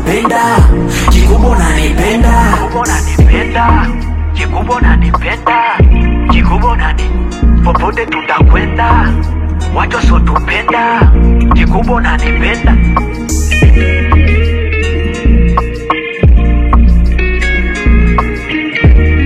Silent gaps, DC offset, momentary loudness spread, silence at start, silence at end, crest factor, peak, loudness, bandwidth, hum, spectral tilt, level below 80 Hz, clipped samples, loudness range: none; under 0.1%; 6 LU; 0 s; 0 s; 8 dB; 0 dBFS; -10 LUFS; 13.5 kHz; none; -6 dB/octave; -10 dBFS; 0.6%; 1 LU